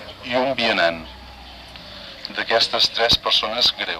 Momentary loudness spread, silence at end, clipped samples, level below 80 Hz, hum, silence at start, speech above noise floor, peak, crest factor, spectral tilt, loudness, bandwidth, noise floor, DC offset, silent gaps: 23 LU; 0 s; under 0.1%; -46 dBFS; none; 0 s; 20 dB; -4 dBFS; 18 dB; -2.5 dB/octave; -18 LUFS; 15 kHz; -40 dBFS; under 0.1%; none